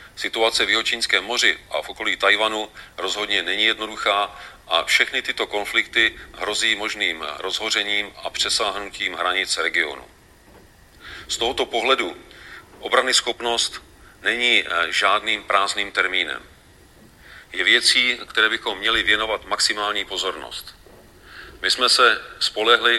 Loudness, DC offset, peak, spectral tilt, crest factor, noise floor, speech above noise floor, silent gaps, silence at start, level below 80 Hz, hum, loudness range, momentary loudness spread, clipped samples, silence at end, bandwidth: -20 LUFS; under 0.1%; 0 dBFS; 0 dB/octave; 22 dB; -50 dBFS; 28 dB; none; 0 s; -52 dBFS; none; 4 LU; 12 LU; under 0.1%; 0 s; 16.5 kHz